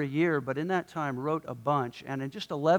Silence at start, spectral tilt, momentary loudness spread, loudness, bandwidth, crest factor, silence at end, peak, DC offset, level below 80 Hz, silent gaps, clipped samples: 0 s; -7 dB/octave; 8 LU; -31 LUFS; 19 kHz; 18 dB; 0 s; -12 dBFS; under 0.1%; -70 dBFS; none; under 0.1%